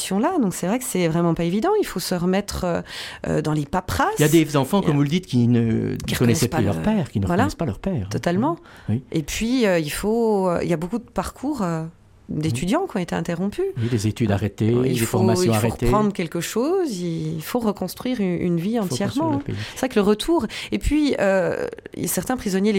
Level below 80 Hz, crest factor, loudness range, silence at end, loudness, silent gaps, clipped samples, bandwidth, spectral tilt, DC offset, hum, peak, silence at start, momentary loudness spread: -40 dBFS; 16 dB; 4 LU; 0 s; -22 LUFS; none; under 0.1%; 17 kHz; -6 dB/octave; under 0.1%; none; -4 dBFS; 0 s; 7 LU